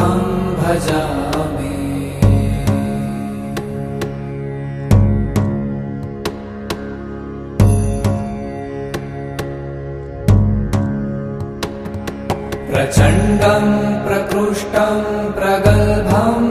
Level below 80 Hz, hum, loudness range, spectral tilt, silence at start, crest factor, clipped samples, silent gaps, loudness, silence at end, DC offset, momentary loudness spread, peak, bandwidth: -28 dBFS; none; 5 LU; -7 dB/octave; 0 s; 16 dB; under 0.1%; none; -18 LUFS; 0 s; under 0.1%; 13 LU; 0 dBFS; 14.5 kHz